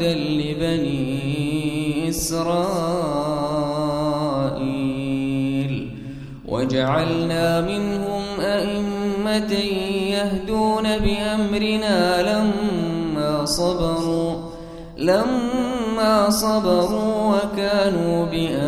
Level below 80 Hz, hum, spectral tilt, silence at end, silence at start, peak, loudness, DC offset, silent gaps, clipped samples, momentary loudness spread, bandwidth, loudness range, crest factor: -40 dBFS; none; -5.5 dB/octave; 0 s; 0 s; -4 dBFS; -21 LUFS; under 0.1%; none; under 0.1%; 6 LU; 15 kHz; 3 LU; 18 dB